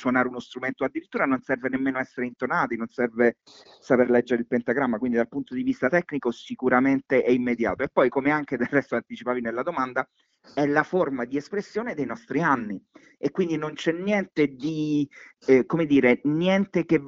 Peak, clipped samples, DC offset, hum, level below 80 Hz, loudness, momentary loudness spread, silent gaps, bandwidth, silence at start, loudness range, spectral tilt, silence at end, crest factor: -4 dBFS; under 0.1%; under 0.1%; none; -62 dBFS; -25 LUFS; 9 LU; none; 7.4 kHz; 0 s; 4 LU; -7 dB/octave; 0 s; 20 dB